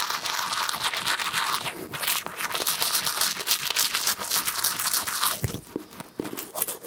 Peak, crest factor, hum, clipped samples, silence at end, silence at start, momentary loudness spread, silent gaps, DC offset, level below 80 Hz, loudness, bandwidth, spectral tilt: -4 dBFS; 24 dB; none; under 0.1%; 0 s; 0 s; 11 LU; none; under 0.1%; -58 dBFS; -25 LUFS; 19 kHz; -0.5 dB/octave